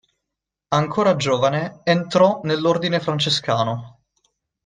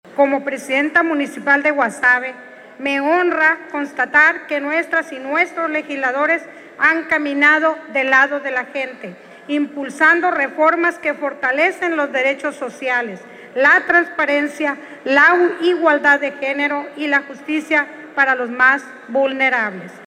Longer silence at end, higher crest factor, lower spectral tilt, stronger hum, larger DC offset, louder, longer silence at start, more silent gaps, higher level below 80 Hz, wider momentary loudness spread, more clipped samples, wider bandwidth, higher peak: first, 0.75 s vs 0 s; about the same, 18 dB vs 16 dB; first, -5.5 dB/octave vs -3.5 dB/octave; neither; neither; second, -19 LUFS vs -16 LUFS; first, 0.7 s vs 0.1 s; neither; first, -58 dBFS vs -64 dBFS; second, 6 LU vs 11 LU; neither; second, 9.6 kHz vs 12.5 kHz; about the same, -2 dBFS vs -2 dBFS